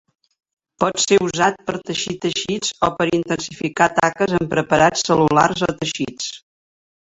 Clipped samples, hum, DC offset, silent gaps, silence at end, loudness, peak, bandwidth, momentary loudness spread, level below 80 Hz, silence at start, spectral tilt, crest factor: under 0.1%; none; under 0.1%; none; 0.8 s; -19 LUFS; -2 dBFS; 8.2 kHz; 9 LU; -50 dBFS; 0.8 s; -4 dB/octave; 18 dB